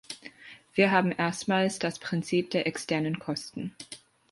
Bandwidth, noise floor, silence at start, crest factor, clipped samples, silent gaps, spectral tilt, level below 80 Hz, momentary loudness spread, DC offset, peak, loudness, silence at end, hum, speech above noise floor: 11.5 kHz; -50 dBFS; 0.1 s; 20 dB; under 0.1%; none; -5 dB/octave; -68 dBFS; 20 LU; under 0.1%; -8 dBFS; -28 LUFS; 0.35 s; none; 22 dB